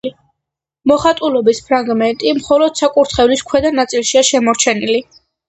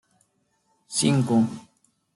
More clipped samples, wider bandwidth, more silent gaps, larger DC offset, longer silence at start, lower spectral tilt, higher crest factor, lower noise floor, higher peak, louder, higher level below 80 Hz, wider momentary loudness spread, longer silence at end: neither; second, 8.8 kHz vs 12 kHz; neither; neither; second, 0.05 s vs 0.9 s; second, -3 dB/octave vs -5 dB/octave; about the same, 14 dB vs 18 dB; first, -80 dBFS vs -70 dBFS; first, 0 dBFS vs -8 dBFS; first, -13 LUFS vs -23 LUFS; first, -44 dBFS vs -66 dBFS; second, 5 LU vs 10 LU; about the same, 0.45 s vs 0.55 s